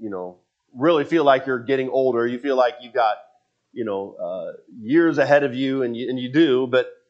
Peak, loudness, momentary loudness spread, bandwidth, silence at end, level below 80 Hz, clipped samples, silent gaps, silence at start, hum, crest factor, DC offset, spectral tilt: -2 dBFS; -21 LUFS; 15 LU; 7.6 kHz; 0.15 s; -76 dBFS; under 0.1%; none; 0 s; none; 18 dB; under 0.1%; -7 dB/octave